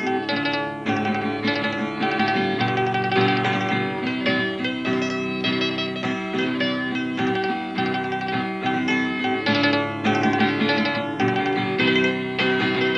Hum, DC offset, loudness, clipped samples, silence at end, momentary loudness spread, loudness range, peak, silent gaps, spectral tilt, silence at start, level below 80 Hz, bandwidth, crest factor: none; under 0.1%; -22 LUFS; under 0.1%; 0 s; 5 LU; 3 LU; -6 dBFS; none; -6 dB/octave; 0 s; -60 dBFS; 9.8 kHz; 16 dB